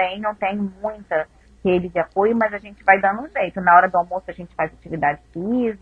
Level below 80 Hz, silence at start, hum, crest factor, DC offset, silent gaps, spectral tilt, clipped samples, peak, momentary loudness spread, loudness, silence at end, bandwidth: -50 dBFS; 0 s; none; 20 dB; under 0.1%; none; -8 dB/octave; under 0.1%; 0 dBFS; 13 LU; -20 LUFS; 0.05 s; 5.2 kHz